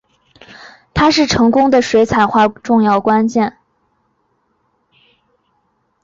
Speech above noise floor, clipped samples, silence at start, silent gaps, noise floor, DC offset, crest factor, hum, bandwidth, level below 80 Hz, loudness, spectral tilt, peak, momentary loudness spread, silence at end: 51 dB; under 0.1%; 0.6 s; none; -63 dBFS; under 0.1%; 14 dB; none; 7.6 kHz; -42 dBFS; -13 LUFS; -5 dB/octave; -2 dBFS; 5 LU; 2.55 s